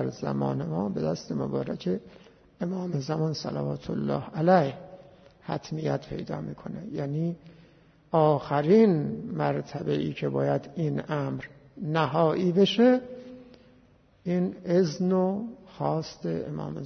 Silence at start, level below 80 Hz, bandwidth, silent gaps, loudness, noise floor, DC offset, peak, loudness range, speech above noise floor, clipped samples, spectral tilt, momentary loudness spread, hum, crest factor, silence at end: 0 s; -62 dBFS; 6.6 kHz; none; -27 LUFS; -59 dBFS; under 0.1%; -8 dBFS; 5 LU; 33 dB; under 0.1%; -7.5 dB/octave; 14 LU; none; 20 dB; 0 s